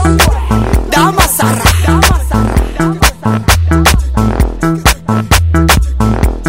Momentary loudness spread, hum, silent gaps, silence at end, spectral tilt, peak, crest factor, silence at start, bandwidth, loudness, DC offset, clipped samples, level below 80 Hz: 4 LU; none; none; 0 s; -4.5 dB/octave; 0 dBFS; 10 dB; 0 s; 16.5 kHz; -10 LUFS; 1%; 0.5%; -14 dBFS